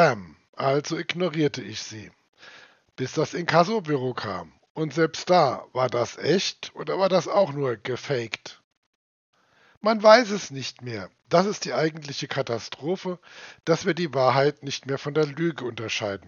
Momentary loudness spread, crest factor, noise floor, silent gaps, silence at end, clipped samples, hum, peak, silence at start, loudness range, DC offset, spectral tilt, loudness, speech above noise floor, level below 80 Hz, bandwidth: 14 LU; 24 dB; -51 dBFS; 0.49-0.53 s, 2.29-2.33 s, 4.70-4.75 s, 8.64-8.71 s, 8.77-9.33 s, 9.77-9.81 s; 0.1 s; under 0.1%; none; 0 dBFS; 0 s; 5 LU; under 0.1%; -5 dB/octave; -25 LUFS; 27 dB; -72 dBFS; 7.4 kHz